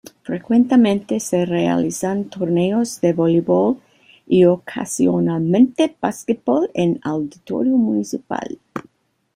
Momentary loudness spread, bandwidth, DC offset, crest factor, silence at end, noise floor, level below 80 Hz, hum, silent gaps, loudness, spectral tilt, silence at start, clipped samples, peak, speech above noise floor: 12 LU; 15.5 kHz; under 0.1%; 16 dB; 0.55 s; -57 dBFS; -58 dBFS; none; none; -18 LUFS; -6.5 dB/octave; 0.3 s; under 0.1%; -2 dBFS; 40 dB